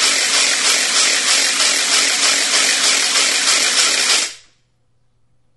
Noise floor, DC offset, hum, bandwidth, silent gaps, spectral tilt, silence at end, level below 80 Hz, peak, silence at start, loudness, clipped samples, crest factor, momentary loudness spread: -63 dBFS; under 0.1%; none; 12 kHz; none; 3 dB/octave; 1.2 s; -62 dBFS; 0 dBFS; 0 s; -12 LUFS; under 0.1%; 16 dB; 1 LU